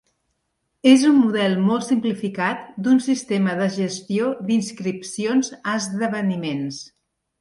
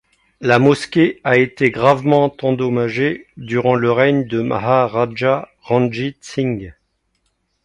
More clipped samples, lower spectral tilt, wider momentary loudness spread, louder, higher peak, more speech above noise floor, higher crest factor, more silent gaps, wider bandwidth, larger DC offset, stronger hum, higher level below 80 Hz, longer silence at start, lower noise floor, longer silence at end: neither; second, -5 dB/octave vs -7 dB/octave; about the same, 11 LU vs 9 LU; second, -21 LUFS vs -16 LUFS; about the same, -2 dBFS vs 0 dBFS; about the same, 54 dB vs 51 dB; about the same, 18 dB vs 16 dB; neither; about the same, 11.5 kHz vs 11 kHz; neither; neither; second, -66 dBFS vs -52 dBFS; first, 0.85 s vs 0.4 s; first, -74 dBFS vs -67 dBFS; second, 0.55 s vs 0.95 s